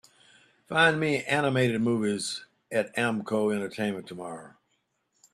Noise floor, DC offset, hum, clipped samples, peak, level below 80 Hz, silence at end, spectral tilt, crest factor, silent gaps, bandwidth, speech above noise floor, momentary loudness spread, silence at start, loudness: -75 dBFS; under 0.1%; none; under 0.1%; -8 dBFS; -68 dBFS; 0.85 s; -5 dB/octave; 22 dB; none; 13.5 kHz; 48 dB; 16 LU; 0.7 s; -27 LUFS